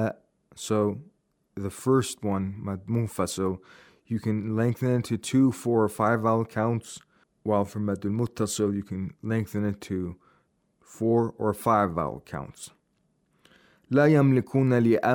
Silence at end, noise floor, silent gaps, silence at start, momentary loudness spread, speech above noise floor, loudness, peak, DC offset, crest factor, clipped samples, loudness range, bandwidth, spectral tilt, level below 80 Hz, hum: 0 s; -71 dBFS; none; 0 s; 15 LU; 46 dB; -26 LUFS; -8 dBFS; under 0.1%; 18 dB; under 0.1%; 4 LU; 19.5 kHz; -6.5 dB/octave; -62 dBFS; none